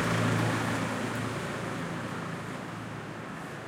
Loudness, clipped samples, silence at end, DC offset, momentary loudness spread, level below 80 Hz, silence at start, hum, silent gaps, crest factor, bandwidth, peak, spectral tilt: -33 LUFS; under 0.1%; 0 s; under 0.1%; 12 LU; -60 dBFS; 0 s; none; none; 16 dB; 16.5 kHz; -16 dBFS; -5.5 dB/octave